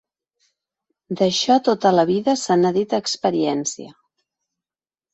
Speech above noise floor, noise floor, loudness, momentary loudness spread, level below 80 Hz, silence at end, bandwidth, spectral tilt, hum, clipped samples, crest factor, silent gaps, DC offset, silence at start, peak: over 71 dB; under -90 dBFS; -19 LUFS; 9 LU; -64 dBFS; 1.2 s; 8.2 kHz; -4.5 dB/octave; none; under 0.1%; 18 dB; none; under 0.1%; 1.1 s; -4 dBFS